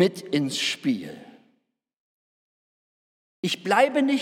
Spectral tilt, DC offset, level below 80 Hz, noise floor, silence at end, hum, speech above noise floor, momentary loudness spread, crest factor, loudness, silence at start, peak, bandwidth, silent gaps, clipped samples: -4.5 dB/octave; under 0.1%; -80 dBFS; -73 dBFS; 0 s; none; 50 dB; 13 LU; 22 dB; -24 LUFS; 0 s; -4 dBFS; 16 kHz; 1.96-3.43 s; under 0.1%